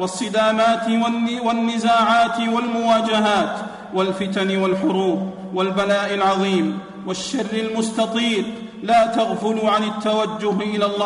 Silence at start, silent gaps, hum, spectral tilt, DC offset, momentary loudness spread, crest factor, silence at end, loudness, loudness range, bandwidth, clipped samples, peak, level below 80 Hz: 0 s; none; none; -5 dB/octave; under 0.1%; 8 LU; 12 dB; 0 s; -20 LUFS; 3 LU; 11 kHz; under 0.1%; -6 dBFS; -58 dBFS